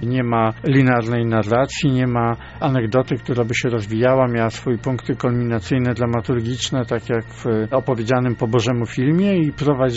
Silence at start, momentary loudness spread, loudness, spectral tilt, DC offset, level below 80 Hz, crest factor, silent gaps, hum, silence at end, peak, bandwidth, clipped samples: 0 s; 6 LU; -19 LUFS; -6 dB/octave; under 0.1%; -44 dBFS; 16 dB; none; none; 0 s; -4 dBFS; 8 kHz; under 0.1%